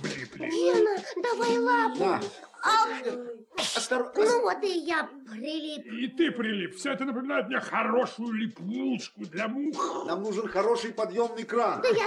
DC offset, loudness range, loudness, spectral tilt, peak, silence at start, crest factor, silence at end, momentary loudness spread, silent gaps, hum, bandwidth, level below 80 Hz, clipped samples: under 0.1%; 4 LU; -28 LUFS; -4 dB/octave; -12 dBFS; 0 s; 16 dB; 0 s; 11 LU; none; none; 12.5 kHz; -74 dBFS; under 0.1%